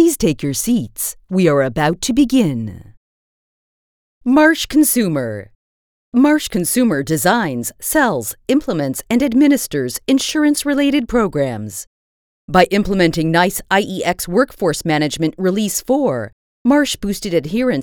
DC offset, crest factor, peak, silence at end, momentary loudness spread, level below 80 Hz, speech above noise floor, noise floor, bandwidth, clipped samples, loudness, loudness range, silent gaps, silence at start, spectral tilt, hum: under 0.1%; 16 dB; 0 dBFS; 0 s; 8 LU; -42 dBFS; over 74 dB; under -90 dBFS; over 20 kHz; under 0.1%; -16 LUFS; 2 LU; 2.97-4.21 s, 5.55-6.12 s, 11.87-12.48 s, 16.33-16.65 s; 0 s; -4.5 dB/octave; none